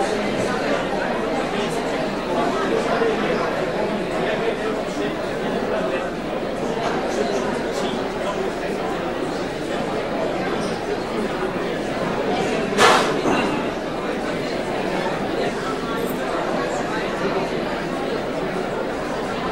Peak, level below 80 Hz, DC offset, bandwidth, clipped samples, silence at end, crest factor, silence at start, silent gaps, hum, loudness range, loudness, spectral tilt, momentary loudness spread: 0 dBFS; -44 dBFS; under 0.1%; 16 kHz; under 0.1%; 0 s; 22 dB; 0 s; none; none; 4 LU; -23 LUFS; -4.5 dB/octave; 5 LU